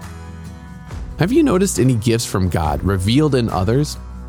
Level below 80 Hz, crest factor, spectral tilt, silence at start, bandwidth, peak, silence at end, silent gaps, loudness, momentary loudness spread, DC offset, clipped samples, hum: -32 dBFS; 14 dB; -6 dB/octave; 0 s; 18.5 kHz; -4 dBFS; 0 s; none; -17 LUFS; 19 LU; under 0.1%; under 0.1%; none